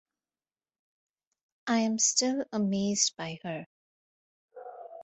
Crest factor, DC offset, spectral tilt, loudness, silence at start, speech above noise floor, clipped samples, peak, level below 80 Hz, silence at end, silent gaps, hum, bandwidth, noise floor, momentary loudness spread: 24 dB; under 0.1%; -3 dB/octave; -28 LUFS; 1.65 s; over 61 dB; under 0.1%; -10 dBFS; -74 dBFS; 0 s; 3.66-4.49 s; none; 8.4 kHz; under -90 dBFS; 21 LU